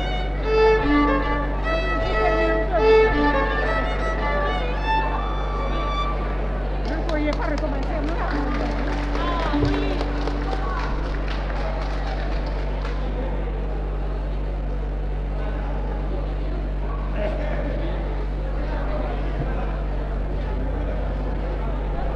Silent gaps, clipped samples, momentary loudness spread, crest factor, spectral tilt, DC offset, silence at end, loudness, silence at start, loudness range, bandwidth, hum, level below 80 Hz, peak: none; under 0.1%; 9 LU; 16 dB; -7.5 dB/octave; under 0.1%; 0 s; -24 LUFS; 0 s; 8 LU; 6.6 kHz; none; -26 dBFS; -6 dBFS